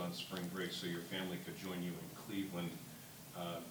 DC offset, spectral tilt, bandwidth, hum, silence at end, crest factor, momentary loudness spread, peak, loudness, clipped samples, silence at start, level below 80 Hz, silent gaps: under 0.1%; -4.5 dB/octave; 19 kHz; none; 0 s; 18 dB; 8 LU; -26 dBFS; -44 LUFS; under 0.1%; 0 s; -76 dBFS; none